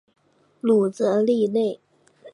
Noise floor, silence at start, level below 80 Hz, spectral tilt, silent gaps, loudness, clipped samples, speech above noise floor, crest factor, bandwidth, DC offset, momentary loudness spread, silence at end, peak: -50 dBFS; 0.65 s; -76 dBFS; -7 dB/octave; none; -22 LUFS; under 0.1%; 30 dB; 14 dB; 11 kHz; under 0.1%; 8 LU; 0.05 s; -8 dBFS